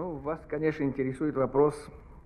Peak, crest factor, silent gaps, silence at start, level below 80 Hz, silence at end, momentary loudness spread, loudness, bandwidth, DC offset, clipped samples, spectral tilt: -12 dBFS; 18 dB; none; 0 s; -52 dBFS; 0.05 s; 12 LU; -29 LUFS; 11 kHz; under 0.1%; under 0.1%; -8.5 dB/octave